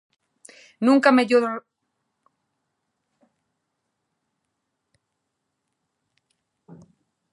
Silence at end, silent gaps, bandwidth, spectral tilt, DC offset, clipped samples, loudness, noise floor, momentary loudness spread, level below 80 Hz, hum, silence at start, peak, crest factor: 5.75 s; none; 11.5 kHz; -5 dB/octave; under 0.1%; under 0.1%; -19 LUFS; -79 dBFS; 13 LU; -80 dBFS; none; 0.8 s; -2 dBFS; 24 dB